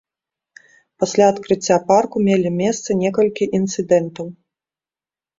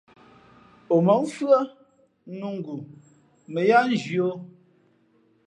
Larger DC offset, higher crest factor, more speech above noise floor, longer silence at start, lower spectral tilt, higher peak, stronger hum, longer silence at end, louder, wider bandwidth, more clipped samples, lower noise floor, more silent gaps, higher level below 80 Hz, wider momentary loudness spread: neither; about the same, 18 dB vs 20 dB; first, over 73 dB vs 40 dB; about the same, 1 s vs 0.9 s; second, -5.5 dB/octave vs -7 dB/octave; first, -2 dBFS vs -6 dBFS; neither; about the same, 1.1 s vs 1 s; first, -18 LUFS vs -23 LUFS; second, 7.8 kHz vs 11 kHz; neither; first, under -90 dBFS vs -63 dBFS; neither; first, -58 dBFS vs -74 dBFS; second, 7 LU vs 18 LU